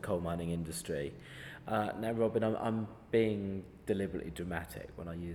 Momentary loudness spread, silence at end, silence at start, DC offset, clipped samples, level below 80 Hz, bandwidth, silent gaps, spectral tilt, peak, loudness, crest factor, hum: 13 LU; 0 s; 0 s; under 0.1%; under 0.1%; -58 dBFS; 19.5 kHz; none; -6.5 dB/octave; -18 dBFS; -36 LUFS; 18 dB; none